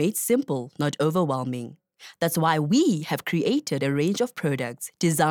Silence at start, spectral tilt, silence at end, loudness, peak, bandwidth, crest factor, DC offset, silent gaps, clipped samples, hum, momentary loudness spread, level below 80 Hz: 0 s; -5 dB/octave; 0 s; -25 LUFS; -8 dBFS; 19.5 kHz; 18 dB; under 0.1%; none; under 0.1%; none; 8 LU; -70 dBFS